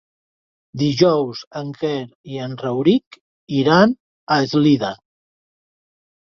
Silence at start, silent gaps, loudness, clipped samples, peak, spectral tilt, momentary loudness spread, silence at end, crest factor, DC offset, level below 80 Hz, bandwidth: 0.75 s; 1.47-1.51 s, 2.15-2.24 s, 3.06-3.11 s, 3.21-3.47 s, 4.00-4.27 s; -18 LUFS; under 0.1%; -2 dBFS; -6.5 dB/octave; 15 LU; 1.35 s; 18 dB; under 0.1%; -60 dBFS; 7.2 kHz